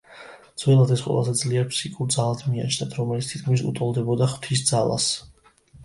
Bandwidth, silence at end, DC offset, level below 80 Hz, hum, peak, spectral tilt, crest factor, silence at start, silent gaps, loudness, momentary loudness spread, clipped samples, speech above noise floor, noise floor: 11.5 kHz; 0 s; under 0.1%; -56 dBFS; none; -4 dBFS; -5 dB/octave; 18 dB; 0.1 s; none; -23 LUFS; 8 LU; under 0.1%; 30 dB; -52 dBFS